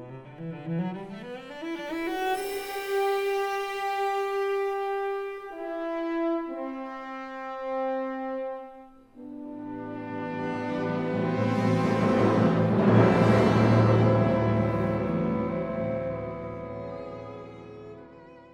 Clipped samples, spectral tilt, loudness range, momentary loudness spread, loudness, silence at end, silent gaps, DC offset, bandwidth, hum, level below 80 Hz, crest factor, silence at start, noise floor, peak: under 0.1%; -7.5 dB/octave; 12 LU; 19 LU; -27 LUFS; 0 s; none; under 0.1%; 19.5 kHz; none; -54 dBFS; 20 dB; 0 s; -49 dBFS; -6 dBFS